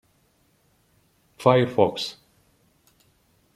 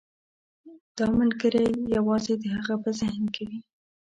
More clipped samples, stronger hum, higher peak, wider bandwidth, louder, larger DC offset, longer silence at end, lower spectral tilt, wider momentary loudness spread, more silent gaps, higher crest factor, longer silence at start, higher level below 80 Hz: neither; neither; first, -2 dBFS vs -12 dBFS; first, 14 kHz vs 8.8 kHz; first, -22 LUFS vs -26 LUFS; neither; first, 1.45 s vs 0.45 s; about the same, -6 dB/octave vs -6 dB/octave; about the same, 12 LU vs 12 LU; second, none vs 0.80-0.95 s; first, 24 dB vs 14 dB; first, 1.4 s vs 0.65 s; second, -66 dBFS vs -56 dBFS